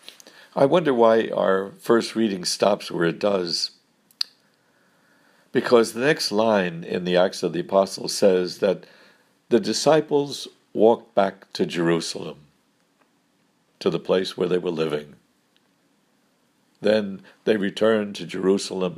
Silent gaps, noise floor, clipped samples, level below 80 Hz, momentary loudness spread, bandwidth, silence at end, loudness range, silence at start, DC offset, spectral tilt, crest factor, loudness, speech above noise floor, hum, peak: none; -65 dBFS; under 0.1%; -72 dBFS; 11 LU; 15.5 kHz; 0 s; 6 LU; 0.55 s; under 0.1%; -4.5 dB/octave; 20 dB; -22 LUFS; 44 dB; none; -2 dBFS